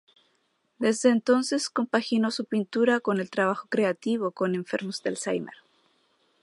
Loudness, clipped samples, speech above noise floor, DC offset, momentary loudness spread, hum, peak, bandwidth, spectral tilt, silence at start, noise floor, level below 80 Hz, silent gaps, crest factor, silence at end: -26 LUFS; under 0.1%; 46 dB; under 0.1%; 7 LU; none; -8 dBFS; 11.5 kHz; -4.5 dB/octave; 0.8 s; -72 dBFS; -78 dBFS; none; 18 dB; 0.9 s